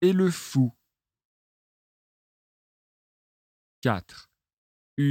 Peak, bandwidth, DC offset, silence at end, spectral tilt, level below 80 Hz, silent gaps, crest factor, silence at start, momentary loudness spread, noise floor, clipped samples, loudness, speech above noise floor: -8 dBFS; 16.5 kHz; under 0.1%; 0 s; -7 dB/octave; -66 dBFS; 1.25-3.82 s, 4.53-4.97 s; 22 dB; 0 s; 8 LU; under -90 dBFS; under 0.1%; -27 LUFS; over 66 dB